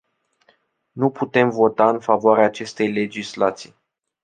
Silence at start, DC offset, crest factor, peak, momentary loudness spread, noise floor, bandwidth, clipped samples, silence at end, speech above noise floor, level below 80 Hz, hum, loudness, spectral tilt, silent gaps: 0.95 s; under 0.1%; 18 dB; -2 dBFS; 8 LU; -62 dBFS; 9.4 kHz; under 0.1%; 0.55 s; 43 dB; -66 dBFS; none; -19 LUFS; -6 dB/octave; none